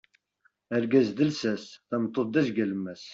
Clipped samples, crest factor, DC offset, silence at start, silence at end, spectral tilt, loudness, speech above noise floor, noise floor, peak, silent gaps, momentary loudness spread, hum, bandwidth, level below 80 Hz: under 0.1%; 18 dB; under 0.1%; 0.7 s; 0 s; -6.5 dB/octave; -28 LUFS; 43 dB; -70 dBFS; -10 dBFS; none; 9 LU; none; 7.8 kHz; -70 dBFS